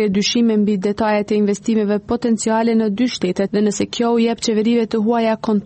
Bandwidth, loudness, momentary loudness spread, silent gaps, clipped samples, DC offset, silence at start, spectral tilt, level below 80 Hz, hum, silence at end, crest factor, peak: 8.8 kHz; -17 LUFS; 3 LU; none; under 0.1%; under 0.1%; 0 s; -5 dB/octave; -52 dBFS; none; 0 s; 10 dB; -6 dBFS